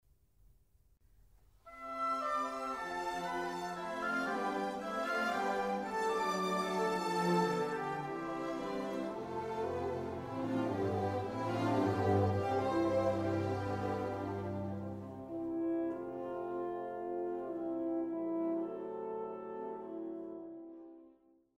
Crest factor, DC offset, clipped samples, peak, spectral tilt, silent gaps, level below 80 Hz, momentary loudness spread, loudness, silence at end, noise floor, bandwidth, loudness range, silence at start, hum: 18 dB; under 0.1%; under 0.1%; -20 dBFS; -6.5 dB/octave; none; -68 dBFS; 11 LU; -37 LUFS; 0.45 s; -69 dBFS; 15.5 kHz; 6 LU; 1.65 s; none